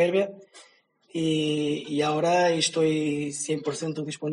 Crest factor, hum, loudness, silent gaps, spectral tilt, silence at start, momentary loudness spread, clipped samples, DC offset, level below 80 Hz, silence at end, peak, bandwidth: 16 dB; none; -26 LUFS; none; -4.5 dB/octave; 0 s; 9 LU; under 0.1%; under 0.1%; -70 dBFS; 0 s; -10 dBFS; 10.5 kHz